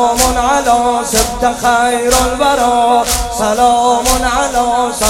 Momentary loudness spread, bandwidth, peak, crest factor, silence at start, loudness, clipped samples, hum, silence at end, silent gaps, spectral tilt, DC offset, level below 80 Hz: 3 LU; 17 kHz; 0 dBFS; 12 dB; 0 s; -12 LUFS; under 0.1%; none; 0 s; none; -2.5 dB/octave; under 0.1%; -26 dBFS